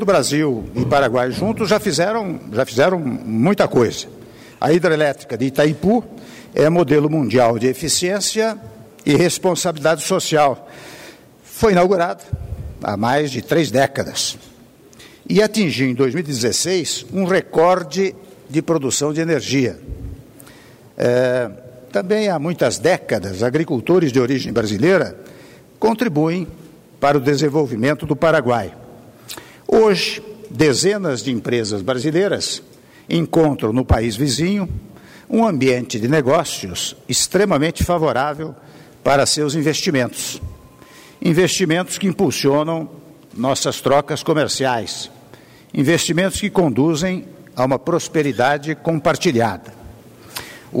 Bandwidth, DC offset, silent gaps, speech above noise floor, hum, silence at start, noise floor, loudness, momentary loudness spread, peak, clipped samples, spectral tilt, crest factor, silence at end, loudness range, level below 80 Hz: 16 kHz; under 0.1%; none; 28 dB; none; 0 s; -45 dBFS; -18 LUFS; 13 LU; -4 dBFS; under 0.1%; -4.5 dB/octave; 14 dB; 0 s; 2 LU; -42 dBFS